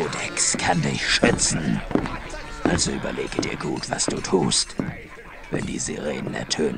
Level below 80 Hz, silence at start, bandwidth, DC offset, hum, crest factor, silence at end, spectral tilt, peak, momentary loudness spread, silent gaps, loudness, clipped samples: -40 dBFS; 0 s; 10.5 kHz; under 0.1%; none; 22 dB; 0 s; -3.5 dB/octave; -4 dBFS; 12 LU; none; -23 LUFS; under 0.1%